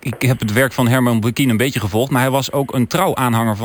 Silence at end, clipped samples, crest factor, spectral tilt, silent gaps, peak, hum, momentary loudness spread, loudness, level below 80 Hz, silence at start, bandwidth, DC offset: 0 s; under 0.1%; 12 dB; -5.5 dB/octave; none; -4 dBFS; none; 3 LU; -16 LUFS; -48 dBFS; 0.05 s; 19.5 kHz; under 0.1%